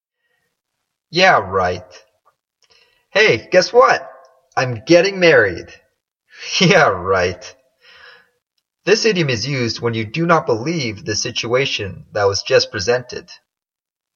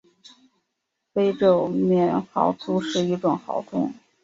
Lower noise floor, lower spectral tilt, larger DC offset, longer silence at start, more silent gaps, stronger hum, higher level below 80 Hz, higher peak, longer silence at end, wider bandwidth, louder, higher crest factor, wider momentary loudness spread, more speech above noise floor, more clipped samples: first, -88 dBFS vs -79 dBFS; second, -4 dB/octave vs -7 dB/octave; neither; about the same, 1.1 s vs 1.15 s; neither; neither; first, -54 dBFS vs -66 dBFS; first, 0 dBFS vs -4 dBFS; first, 0.8 s vs 0.3 s; about the same, 7.4 kHz vs 7.8 kHz; first, -16 LUFS vs -23 LUFS; about the same, 18 dB vs 18 dB; first, 11 LU vs 8 LU; first, 72 dB vs 57 dB; neither